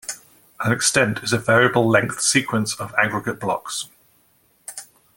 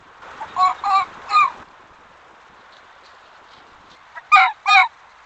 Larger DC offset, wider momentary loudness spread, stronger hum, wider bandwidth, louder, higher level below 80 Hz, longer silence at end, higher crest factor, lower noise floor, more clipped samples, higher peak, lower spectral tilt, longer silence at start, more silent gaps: neither; first, 20 LU vs 8 LU; neither; first, 17 kHz vs 8.8 kHz; second, -19 LUFS vs -16 LUFS; first, -58 dBFS vs -64 dBFS; about the same, 0.35 s vs 0.35 s; about the same, 20 dB vs 20 dB; first, -60 dBFS vs -47 dBFS; neither; about the same, -2 dBFS vs 0 dBFS; first, -3.5 dB/octave vs 0.5 dB/octave; second, 0.05 s vs 0.25 s; neither